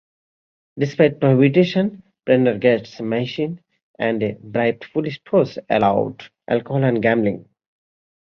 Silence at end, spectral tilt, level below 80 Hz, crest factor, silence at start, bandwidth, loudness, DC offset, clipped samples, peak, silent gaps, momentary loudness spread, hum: 0.9 s; -8.5 dB/octave; -58 dBFS; 18 dB; 0.75 s; 6.6 kHz; -19 LUFS; under 0.1%; under 0.1%; -2 dBFS; 3.83-3.94 s; 10 LU; none